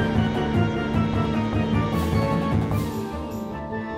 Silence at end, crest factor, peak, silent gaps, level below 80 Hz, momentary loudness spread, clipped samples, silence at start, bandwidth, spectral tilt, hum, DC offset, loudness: 0 s; 14 dB; -10 dBFS; none; -36 dBFS; 8 LU; under 0.1%; 0 s; 16 kHz; -7.5 dB/octave; none; under 0.1%; -24 LUFS